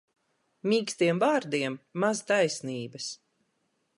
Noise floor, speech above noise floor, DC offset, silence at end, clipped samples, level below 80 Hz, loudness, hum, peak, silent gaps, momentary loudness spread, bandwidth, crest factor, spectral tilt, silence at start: -75 dBFS; 48 dB; under 0.1%; 0.8 s; under 0.1%; -80 dBFS; -28 LUFS; none; -12 dBFS; none; 12 LU; 11.5 kHz; 18 dB; -4.5 dB/octave; 0.65 s